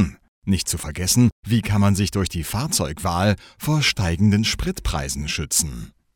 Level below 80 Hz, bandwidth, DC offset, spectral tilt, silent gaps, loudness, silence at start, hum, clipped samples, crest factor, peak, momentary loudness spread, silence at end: -36 dBFS; 18.5 kHz; under 0.1%; -4.5 dB/octave; 0.28-0.42 s, 1.32-1.43 s; -21 LUFS; 0 s; none; under 0.1%; 16 dB; -4 dBFS; 7 LU; 0.25 s